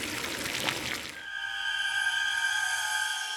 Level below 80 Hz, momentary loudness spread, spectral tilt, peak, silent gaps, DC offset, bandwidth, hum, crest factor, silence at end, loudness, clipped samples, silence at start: -62 dBFS; 7 LU; -0.5 dB/octave; -6 dBFS; none; under 0.1%; over 20 kHz; none; 26 dB; 0 s; -29 LUFS; under 0.1%; 0 s